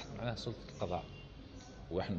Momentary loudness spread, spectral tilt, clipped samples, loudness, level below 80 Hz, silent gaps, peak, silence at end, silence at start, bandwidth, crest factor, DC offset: 12 LU; -6 dB/octave; under 0.1%; -43 LUFS; -56 dBFS; none; -24 dBFS; 0 s; 0 s; 8.6 kHz; 18 dB; under 0.1%